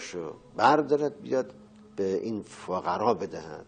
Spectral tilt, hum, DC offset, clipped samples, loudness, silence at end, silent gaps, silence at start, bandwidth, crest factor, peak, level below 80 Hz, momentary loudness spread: -5.5 dB/octave; none; under 0.1%; under 0.1%; -28 LUFS; 0.05 s; none; 0 s; 9.4 kHz; 20 dB; -8 dBFS; -68 dBFS; 16 LU